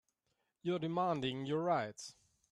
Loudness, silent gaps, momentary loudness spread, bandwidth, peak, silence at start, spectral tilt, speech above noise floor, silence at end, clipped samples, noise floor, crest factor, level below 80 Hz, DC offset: -37 LUFS; none; 12 LU; 12 kHz; -22 dBFS; 0.65 s; -6 dB/octave; 47 dB; 0.4 s; under 0.1%; -84 dBFS; 18 dB; -76 dBFS; under 0.1%